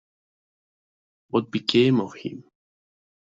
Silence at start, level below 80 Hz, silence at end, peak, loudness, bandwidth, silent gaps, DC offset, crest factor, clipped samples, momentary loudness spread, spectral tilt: 1.35 s; -66 dBFS; 0.85 s; -4 dBFS; -23 LUFS; 7.8 kHz; none; under 0.1%; 24 dB; under 0.1%; 17 LU; -6.5 dB/octave